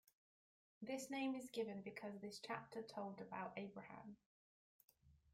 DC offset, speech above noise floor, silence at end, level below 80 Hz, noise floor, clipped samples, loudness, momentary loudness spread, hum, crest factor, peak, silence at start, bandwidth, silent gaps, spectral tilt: under 0.1%; over 40 dB; 0.05 s; -86 dBFS; under -90 dBFS; under 0.1%; -50 LUFS; 12 LU; none; 22 dB; -30 dBFS; 0.8 s; 16 kHz; 4.26-4.88 s; -4.5 dB/octave